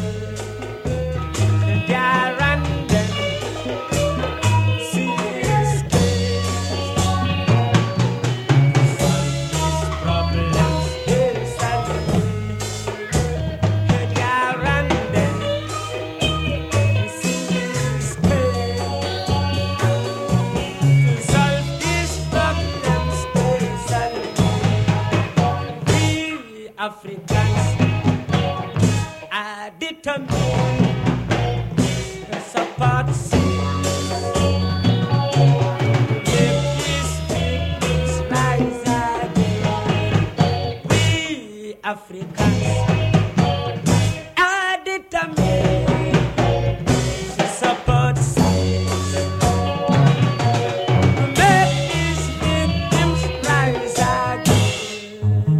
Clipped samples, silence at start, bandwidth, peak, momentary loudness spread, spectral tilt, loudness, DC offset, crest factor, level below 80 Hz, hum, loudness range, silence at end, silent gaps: under 0.1%; 0 s; 14.5 kHz; -2 dBFS; 7 LU; -5.5 dB/octave; -19 LUFS; under 0.1%; 18 dB; -34 dBFS; none; 3 LU; 0 s; none